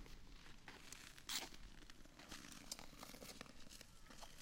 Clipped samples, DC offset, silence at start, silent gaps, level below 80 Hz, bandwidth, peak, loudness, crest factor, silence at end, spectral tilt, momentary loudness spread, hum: under 0.1%; under 0.1%; 0 s; none; -64 dBFS; 16.5 kHz; -28 dBFS; -54 LUFS; 28 dB; 0 s; -1.5 dB/octave; 15 LU; none